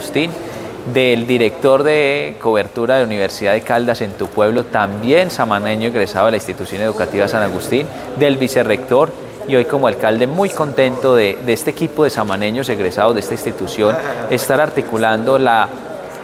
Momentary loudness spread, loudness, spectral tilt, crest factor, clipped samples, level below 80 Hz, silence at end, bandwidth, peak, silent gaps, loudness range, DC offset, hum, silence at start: 7 LU; -16 LUFS; -5 dB/octave; 16 dB; under 0.1%; -50 dBFS; 0 s; 16 kHz; 0 dBFS; none; 2 LU; under 0.1%; none; 0 s